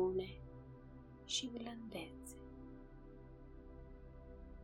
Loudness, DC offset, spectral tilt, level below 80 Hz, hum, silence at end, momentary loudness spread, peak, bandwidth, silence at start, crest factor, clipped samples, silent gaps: -48 LUFS; under 0.1%; -4 dB/octave; -60 dBFS; none; 0 s; 18 LU; -26 dBFS; 14 kHz; 0 s; 20 dB; under 0.1%; none